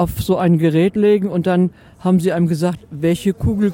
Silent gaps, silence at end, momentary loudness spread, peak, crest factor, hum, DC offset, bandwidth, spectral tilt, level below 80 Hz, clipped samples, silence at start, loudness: none; 0 s; 7 LU; -4 dBFS; 12 dB; none; under 0.1%; 17 kHz; -7.5 dB/octave; -38 dBFS; under 0.1%; 0 s; -17 LUFS